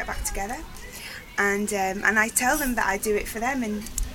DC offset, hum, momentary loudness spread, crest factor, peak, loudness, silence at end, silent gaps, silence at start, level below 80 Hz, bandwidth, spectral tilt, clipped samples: under 0.1%; none; 15 LU; 20 dB; -6 dBFS; -24 LUFS; 0 s; none; 0 s; -38 dBFS; 19 kHz; -3 dB/octave; under 0.1%